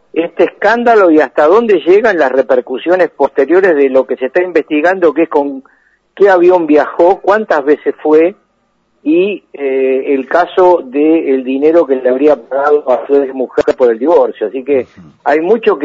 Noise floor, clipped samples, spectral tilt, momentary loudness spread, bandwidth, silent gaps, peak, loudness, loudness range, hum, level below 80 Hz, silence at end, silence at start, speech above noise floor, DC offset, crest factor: -58 dBFS; 0.2%; -6.5 dB/octave; 7 LU; 7.6 kHz; none; 0 dBFS; -10 LUFS; 3 LU; none; -54 dBFS; 0 s; 0.15 s; 48 dB; under 0.1%; 10 dB